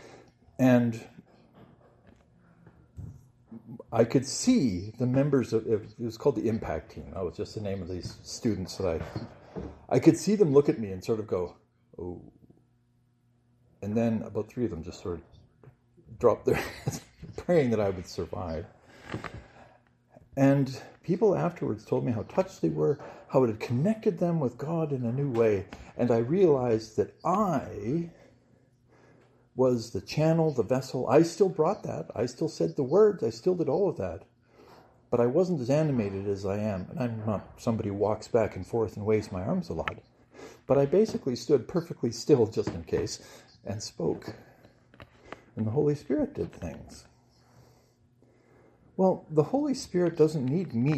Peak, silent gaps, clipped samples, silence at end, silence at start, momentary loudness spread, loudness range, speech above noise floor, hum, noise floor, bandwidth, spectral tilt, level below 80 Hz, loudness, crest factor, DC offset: -8 dBFS; none; under 0.1%; 0 s; 0.05 s; 17 LU; 7 LU; 40 dB; none; -68 dBFS; 13.5 kHz; -7 dB/octave; -58 dBFS; -28 LUFS; 22 dB; under 0.1%